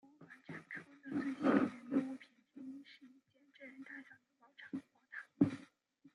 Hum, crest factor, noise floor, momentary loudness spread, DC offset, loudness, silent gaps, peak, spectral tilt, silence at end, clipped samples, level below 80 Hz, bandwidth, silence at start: none; 26 dB; -69 dBFS; 23 LU; under 0.1%; -39 LUFS; none; -16 dBFS; -7.5 dB/octave; 0.05 s; under 0.1%; -82 dBFS; 10.5 kHz; 0.2 s